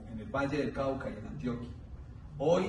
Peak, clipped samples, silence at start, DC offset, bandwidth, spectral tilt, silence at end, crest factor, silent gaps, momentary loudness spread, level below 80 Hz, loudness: -16 dBFS; under 0.1%; 0 s; under 0.1%; 10.5 kHz; -7 dB/octave; 0 s; 18 dB; none; 15 LU; -50 dBFS; -35 LUFS